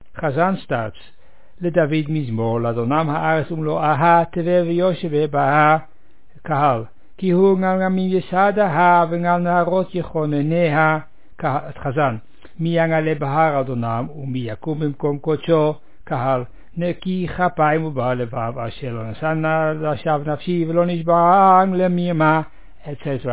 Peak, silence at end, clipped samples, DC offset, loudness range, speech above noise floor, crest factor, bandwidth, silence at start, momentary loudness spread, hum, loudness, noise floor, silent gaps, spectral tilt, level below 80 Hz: -2 dBFS; 0 s; under 0.1%; 2%; 5 LU; 34 dB; 16 dB; 4 kHz; 0.15 s; 11 LU; none; -19 LUFS; -52 dBFS; none; -11 dB/octave; -50 dBFS